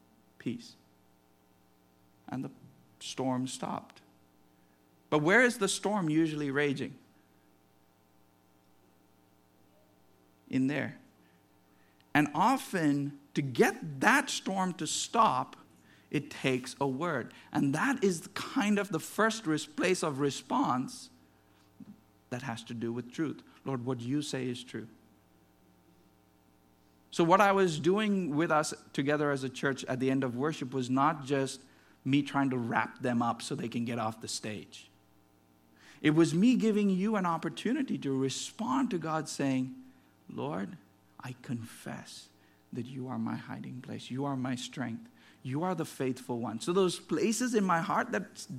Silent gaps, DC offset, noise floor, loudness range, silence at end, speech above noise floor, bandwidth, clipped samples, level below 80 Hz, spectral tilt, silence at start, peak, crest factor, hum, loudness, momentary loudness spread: none; under 0.1%; -66 dBFS; 11 LU; 0 s; 35 dB; 15.5 kHz; under 0.1%; -76 dBFS; -5 dB/octave; 0.45 s; -8 dBFS; 26 dB; none; -31 LUFS; 16 LU